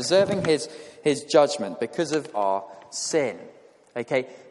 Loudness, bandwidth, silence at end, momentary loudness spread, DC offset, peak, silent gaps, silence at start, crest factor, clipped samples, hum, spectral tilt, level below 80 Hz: -25 LUFS; 11.5 kHz; 0 s; 15 LU; under 0.1%; -6 dBFS; none; 0 s; 18 dB; under 0.1%; none; -4 dB/octave; -66 dBFS